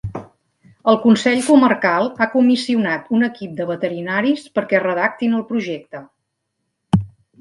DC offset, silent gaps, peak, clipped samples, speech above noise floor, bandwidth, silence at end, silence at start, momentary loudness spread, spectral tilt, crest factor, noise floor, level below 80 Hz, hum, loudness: under 0.1%; none; 0 dBFS; under 0.1%; 57 dB; 11.5 kHz; 0.35 s; 0.05 s; 14 LU; -6 dB/octave; 18 dB; -74 dBFS; -50 dBFS; none; -17 LUFS